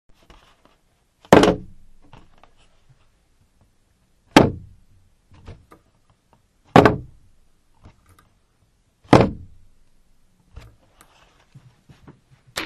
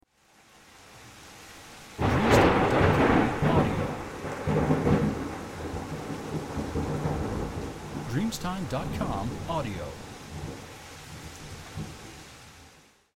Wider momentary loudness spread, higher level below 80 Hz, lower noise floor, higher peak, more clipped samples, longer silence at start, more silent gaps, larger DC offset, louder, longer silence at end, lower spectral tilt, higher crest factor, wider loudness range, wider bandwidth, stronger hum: second, 18 LU vs 23 LU; about the same, -44 dBFS vs -42 dBFS; about the same, -62 dBFS vs -60 dBFS; first, 0 dBFS vs -8 dBFS; neither; first, 1.3 s vs 0.8 s; neither; neither; first, -17 LUFS vs -28 LUFS; second, 0 s vs 0.45 s; about the same, -6 dB/octave vs -6.5 dB/octave; about the same, 24 dB vs 22 dB; second, 4 LU vs 12 LU; second, 13.5 kHz vs 16.5 kHz; neither